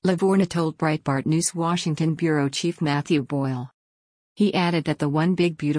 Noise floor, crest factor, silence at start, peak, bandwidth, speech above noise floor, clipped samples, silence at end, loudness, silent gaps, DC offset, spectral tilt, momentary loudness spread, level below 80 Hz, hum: under -90 dBFS; 14 dB; 0.05 s; -8 dBFS; 10.5 kHz; over 68 dB; under 0.1%; 0 s; -23 LUFS; 3.74-4.35 s; under 0.1%; -5.5 dB/octave; 5 LU; -60 dBFS; none